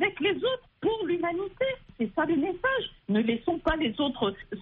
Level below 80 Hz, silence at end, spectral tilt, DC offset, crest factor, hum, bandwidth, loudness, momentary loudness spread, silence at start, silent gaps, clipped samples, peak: -50 dBFS; 0 s; -3 dB/octave; under 0.1%; 14 dB; none; 4.3 kHz; -29 LUFS; 4 LU; 0 s; none; under 0.1%; -14 dBFS